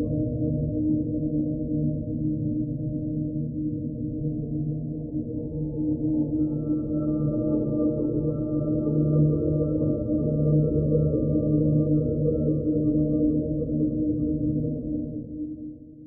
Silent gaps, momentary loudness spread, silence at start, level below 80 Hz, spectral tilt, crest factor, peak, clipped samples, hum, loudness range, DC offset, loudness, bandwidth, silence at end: none; 8 LU; 0 s; -42 dBFS; -19.5 dB/octave; 14 dB; -12 dBFS; under 0.1%; none; 6 LU; under 0.1%; -26 LUFS; 1.4 kHz; 0 s